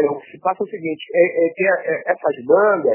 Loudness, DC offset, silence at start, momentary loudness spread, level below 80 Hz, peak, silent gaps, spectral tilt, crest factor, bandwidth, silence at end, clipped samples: -19 LUFS; under 0.1%; 0 s; 9 LU; -72 dBFS; -2 dBFS; none; -9.5 dB/octave; 16 dB; 3.2 kHz; 0 s; under 0.1%